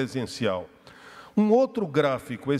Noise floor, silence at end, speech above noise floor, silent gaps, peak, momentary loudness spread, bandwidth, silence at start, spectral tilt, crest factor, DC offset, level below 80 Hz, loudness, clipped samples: -48 dBFS; 0 s; 24 dB; none; -10 dBFS; 10 LU; 13.5 kHz; 0 s; -6.5 dB/octave; 16 dB; under 0.1%; -64 dBFS; -25 LUFS; under 0.1%